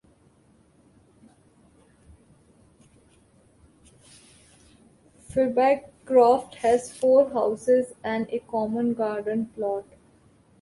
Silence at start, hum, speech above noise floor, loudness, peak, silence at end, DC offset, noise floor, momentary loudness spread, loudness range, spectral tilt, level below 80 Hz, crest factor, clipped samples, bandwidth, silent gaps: 5.3 s; none; 37 dB; -24 LUFS; -8 dBFS; 0.8 s; under 0.1%; -60 dBFS; 10 LU; 7 LU; -5.5 dB/octave; -62 dBFS; 20 dB; under 0.1%; 11.5 kHz; none